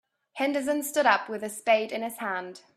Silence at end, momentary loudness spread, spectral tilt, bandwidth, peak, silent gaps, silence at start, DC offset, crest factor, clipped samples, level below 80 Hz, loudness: 0.2 s; 11 LU; -2.5 dB/octave; 16 kHz; -8 dBFS; none; 0.35 s; under 0.1%; 20 dB; under 0.1%; -76 dBFS; -27 LUFS